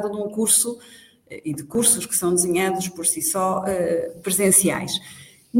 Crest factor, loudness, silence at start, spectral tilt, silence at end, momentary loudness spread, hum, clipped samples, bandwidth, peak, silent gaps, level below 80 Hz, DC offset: 20 dB; -20 LUFS; 0 s; -3 dB/octave; 0 s; 12 LU; none; under 0.1%; 17 kHz; -2 dBFS; none; -60 dBFS; under 0.1%